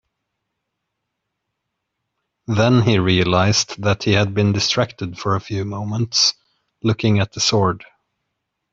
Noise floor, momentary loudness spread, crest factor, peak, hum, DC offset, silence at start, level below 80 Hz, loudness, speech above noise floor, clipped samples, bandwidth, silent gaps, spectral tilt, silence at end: -78 dBFS; 9 LU; 18 dB; -2 dBFS; none; under 0.1%; 2.5 s; -52 dBFS; -18 LUFS; 60 dB; under 0.1%; 7.8 kHz; none; -4.5 dB/octave; 0.9 s